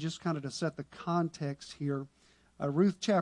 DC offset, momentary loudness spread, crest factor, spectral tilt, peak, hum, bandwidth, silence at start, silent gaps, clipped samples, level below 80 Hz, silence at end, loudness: under 0.1%; 10 LU; 18 dB; -6.5 dB/octave; -16 dBFS; none; 11 kHz; 0 s; none; under 0.1%; -70 dBFS; 0 s; -34 LUFS